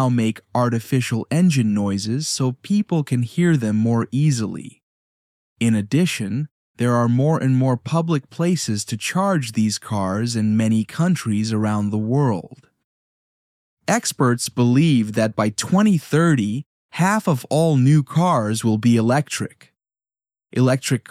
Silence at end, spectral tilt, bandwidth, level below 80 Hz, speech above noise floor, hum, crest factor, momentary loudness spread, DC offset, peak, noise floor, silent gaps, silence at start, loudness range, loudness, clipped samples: 0.1 s; -6 dB/octave; 15 kHz; -66 dBFS; over 71 dB; none; 14 dB; 7 LU; under 0.1%; -4 dBFS; under -90 dBFS; 4.83-5.56 s, 6.51-6.75 s, 12.84-13.77 s, 16.66-16.89 s; 0 s; 4 LU; -20 LUFS; under 0.1%